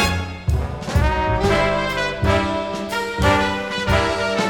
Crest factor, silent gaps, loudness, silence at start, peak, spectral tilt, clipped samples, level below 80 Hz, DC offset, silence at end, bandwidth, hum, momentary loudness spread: 16 dB; none; -20 LUFS; 0 s; -2 dBFS; -5 dB/octave; under 0.1%; -28 dBFS; under 0.1%; 0 s; 18.5 kHz; none; 6 LU